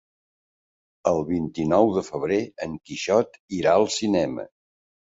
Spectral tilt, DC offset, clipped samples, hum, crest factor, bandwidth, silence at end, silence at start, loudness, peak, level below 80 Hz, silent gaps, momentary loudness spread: -5 dB/octave; under 0.1%; under 0.1%; none; 20 dB; 8 kHz; 0.6 s; 1.05 s; -23 LUFS; -4 dBFS; -54 dBFS; 3.40-3.48 s; 12 LU